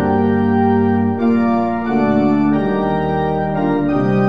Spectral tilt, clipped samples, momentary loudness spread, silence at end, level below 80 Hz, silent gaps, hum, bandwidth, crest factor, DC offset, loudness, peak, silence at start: -10 dB/octave; under 0.1%; 3 LU; 0 s; -42 dBFS; none; none; 5.2 kHz; 12 dB; 1%; -16 LUFS; -4 dBFS; 0 s